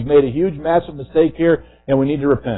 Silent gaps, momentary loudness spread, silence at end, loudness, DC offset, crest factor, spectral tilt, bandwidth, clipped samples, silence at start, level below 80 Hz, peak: none; 5 LU; 0 s; -17 LUFS; under 0.1%; 14 dB; -12.5 dB/octave; 4.1 kHz; under 0.1%; 0 s; -42 dBFS; -2 dBFS